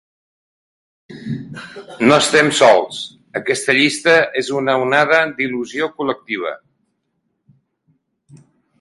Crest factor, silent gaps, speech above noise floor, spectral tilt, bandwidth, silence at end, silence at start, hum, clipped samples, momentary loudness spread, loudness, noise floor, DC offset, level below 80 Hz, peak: 18 dB; none; 54 dB; -3.5 dB/octave; 11.5 kHz; 0.45 s; 1.1 s; none; under 0.1%; 17 LU; -15 LUFS; -70 dBFS; under 0.1%; -60 dBFS; 0 dBFS